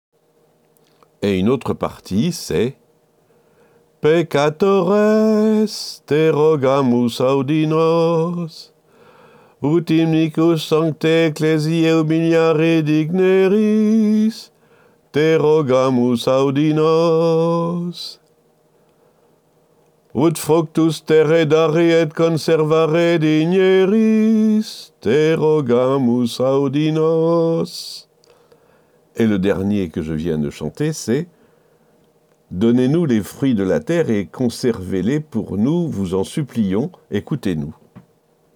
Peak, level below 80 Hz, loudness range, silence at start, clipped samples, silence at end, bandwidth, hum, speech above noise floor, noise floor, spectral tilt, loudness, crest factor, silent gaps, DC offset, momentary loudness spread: -4 dBFS; -54 dBFS; 7 LU; 1.2 s; under 0.1%; 0.55 s; 19 kHz; none; 42 dB; -58 dBFS; -6.5 dB/octave; -17 LUFS; 14 dB; none; under 0.1%; 9 LU